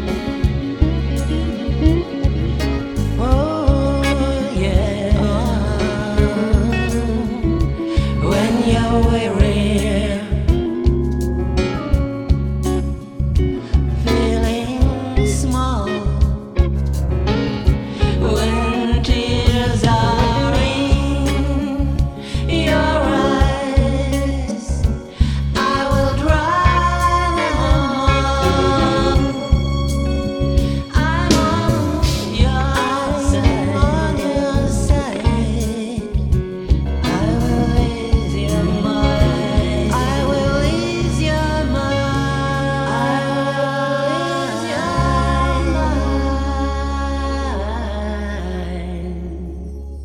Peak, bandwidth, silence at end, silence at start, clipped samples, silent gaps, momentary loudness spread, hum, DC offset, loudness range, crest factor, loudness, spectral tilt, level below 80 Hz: 0 dBFS; 14 kHz; 0 s; 0 s; under 0.1%; none; 5 LU; none; under 0.1%; 3 LU; 16 dB; -18 LUFS; -6.5 dB/octave; -22 dBFS